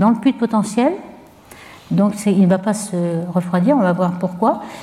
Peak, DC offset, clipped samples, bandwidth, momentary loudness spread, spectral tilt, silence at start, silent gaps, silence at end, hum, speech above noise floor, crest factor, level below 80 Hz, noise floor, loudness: -2 dBFS; under 0.1%; under 0.1%; 13.5 kHz; 6 LU; -7 dB/octave; 0 s; none; 0 s; none; 25 dB; 14 dB; -58 dBFS; -42 dBFS; -17 LUFS